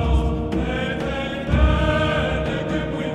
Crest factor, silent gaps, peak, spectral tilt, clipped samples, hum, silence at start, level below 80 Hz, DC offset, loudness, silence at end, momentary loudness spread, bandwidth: 16 dB; none; -4 dBFS; -7 dB/octave; under 0.1%; none; 0 s; -24 dBFS; under 0.1%; -22 LUFS; 0 s; 6 LU; 8.8 kHz